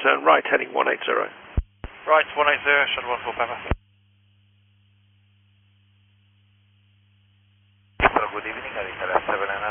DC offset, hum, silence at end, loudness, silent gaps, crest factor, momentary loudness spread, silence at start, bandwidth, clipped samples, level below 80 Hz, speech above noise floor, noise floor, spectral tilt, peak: under 0.1%; none; 0 s; -22 LUFS; none; 24 dB; 13 LU; 0 s; 3.6 kHz; under 0.1%; -40 dBFS; 38 dB; -60 dBFS; -1.5 dB/octave; -2 dBFS